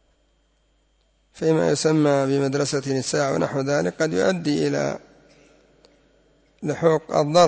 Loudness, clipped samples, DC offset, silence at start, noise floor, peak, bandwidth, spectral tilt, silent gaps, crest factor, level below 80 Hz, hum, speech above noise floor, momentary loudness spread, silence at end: -22 LUFS; under 0.1%; under 0.1%; 1.35 s; -64 dBFS; -4 dBFS; 8 kHz; -5.5 dB/octave; none; 18 dB; -60 dBFS; none; 44 dB; 7 LU; 0 s